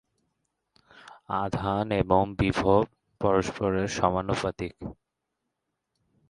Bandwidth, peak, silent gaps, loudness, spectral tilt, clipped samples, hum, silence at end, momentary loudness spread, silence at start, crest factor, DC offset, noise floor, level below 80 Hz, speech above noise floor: 11.5 kHz; -6 dBFS; none; -27 LUFS; -6.5 dB/octave; under 0.1%; none; 1.4 s; 11 LU; 1.1 s; 22 dB; under 0.1%; -82 dBFS; -48 dBFS; 57 dB